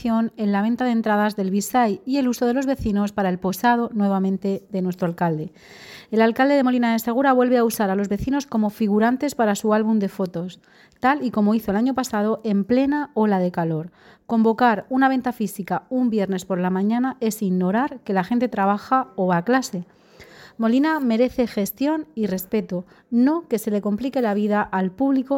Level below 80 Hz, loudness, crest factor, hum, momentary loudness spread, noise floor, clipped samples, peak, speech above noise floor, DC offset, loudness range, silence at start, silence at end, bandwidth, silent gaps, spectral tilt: -52 dBFS; -21 LUFS; 14 dB; none; 7 LU; -46 dBFS; under 0.1%; -6 dBFS; 25 dB; under 0.1%; 3 LU; 0 s; 0 s; 17 kHz; none; -6.5 dB/octave